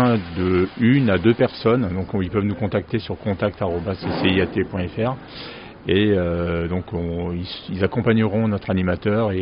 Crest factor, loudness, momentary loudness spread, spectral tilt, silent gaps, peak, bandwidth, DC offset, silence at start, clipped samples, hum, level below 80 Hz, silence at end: 18 dB; -21 LUFS; 9 LU; -6 dB/octave; none; -2 dBFS; 5.4 kHz; under 0.1%; 0 s; under 0.1%; none; -44 dBFS; 0 s